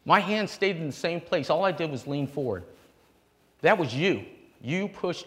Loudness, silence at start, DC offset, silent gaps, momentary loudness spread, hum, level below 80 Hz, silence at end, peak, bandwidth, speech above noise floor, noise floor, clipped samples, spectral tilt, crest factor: -27 LUFS; 0.05 s; under 0.1%; none; 9 LU; none; -66 dBFS; 0 s; -6 dBFS; 16 kHz; 37 dB; -64 dBFS; under 0.1%; -5.5 dB/octave; 22 dB